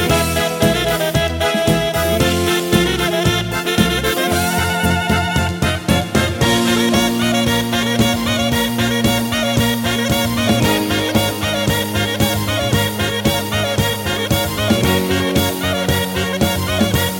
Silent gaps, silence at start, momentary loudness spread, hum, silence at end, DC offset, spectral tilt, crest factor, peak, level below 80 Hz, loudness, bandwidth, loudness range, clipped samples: none; 0 s; 3 LU; none; 0 s; under 0.1%; -4.5 dB/octave; 16 dB; 0 dBFS; -32 dBFS; -16 LUFS; 17 kHz; 1 LU; under 0.1%